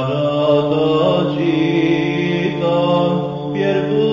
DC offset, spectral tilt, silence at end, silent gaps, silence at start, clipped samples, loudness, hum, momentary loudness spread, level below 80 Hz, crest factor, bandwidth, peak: under 0.1%; -8 dB/octave; 0 s; none; 0 s; under 0.1%; -16 LUFS; none; 3 LU; -52 dBFS; 14 dB; 7.4 kHz; -2 dBFS